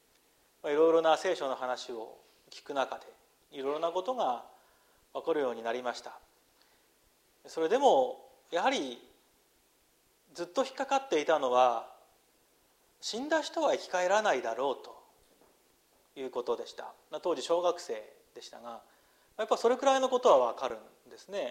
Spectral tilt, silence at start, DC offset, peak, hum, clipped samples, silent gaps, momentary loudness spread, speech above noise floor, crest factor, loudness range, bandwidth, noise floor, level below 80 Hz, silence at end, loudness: -2.5 dB/octave; 0.65 s; under 0.1%; -12 dBFS; none; under 0.1%; none; 21 LU; 38 dB; 20 dB; 6 LU; 15.5 kHz; -69 dBFS; -80 dBFS; 0 s; -31 LUFS